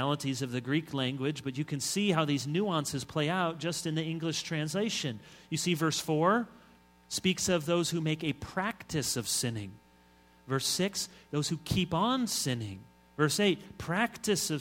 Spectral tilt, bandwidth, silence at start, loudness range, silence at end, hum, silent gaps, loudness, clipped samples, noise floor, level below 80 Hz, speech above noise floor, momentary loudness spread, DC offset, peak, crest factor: -4 dB/octave; 17 kHz; 0 s; 2 LU; 0 s; none; none; -31 LUFS; under 0.1%; -61 dBFS; -62 dBFS; 30 dB; 8 LU; under 0.1%; -12 dBFS; 20 dB